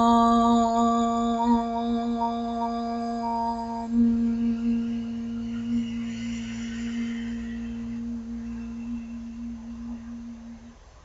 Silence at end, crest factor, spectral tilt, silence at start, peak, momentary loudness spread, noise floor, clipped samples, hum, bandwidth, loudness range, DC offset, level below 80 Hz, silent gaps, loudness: 0.05 s; 18 dB; -6 dB/octave; 0 s; -8 dBFS; 16 LU; -47 dBFS; under 0.1%; none; 8 kHz; 10 LU; under 0.1%; -48 dBFS; none; -27 LUFS